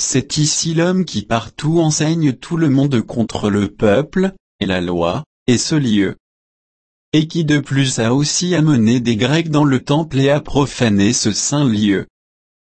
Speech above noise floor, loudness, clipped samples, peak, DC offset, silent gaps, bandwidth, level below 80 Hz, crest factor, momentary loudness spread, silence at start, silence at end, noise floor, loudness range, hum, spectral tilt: over 75 dB; -16 LUFS; under 0.1%; -2 dBFS; under 0.1%; 4.40-4.59 s, 5.26-5.46 s, 6.20-7.12 s; 8.8 kHz; -42 dBFS; 14 dB; 5 LU; 0 s; 0.6 s; under -90 dBFS; 3 LU; none; -5 dB/octave